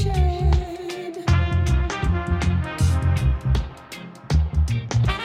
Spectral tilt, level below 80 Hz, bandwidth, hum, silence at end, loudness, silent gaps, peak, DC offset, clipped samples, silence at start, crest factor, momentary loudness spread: -6.5 dB/octave; -24 dBFS; 11.5 kHz; none; 0 s; -22 LUFS; none; -6 dBFS; under 0.1%; under 0.1%; 0 s; 14 dB; 11 LU